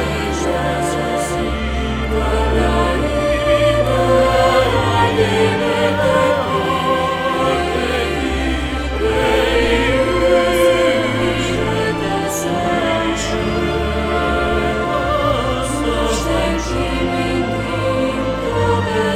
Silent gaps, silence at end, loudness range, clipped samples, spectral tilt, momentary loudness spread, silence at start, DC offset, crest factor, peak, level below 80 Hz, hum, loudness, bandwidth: none; 0 s; 3 LU; under 0.1%; -5 dB/octave; 6 LU; 0 s; under 0.1%; 14 dB; -2 dBFS; -26 dBFS; none; -17 LUFS; 16 kHz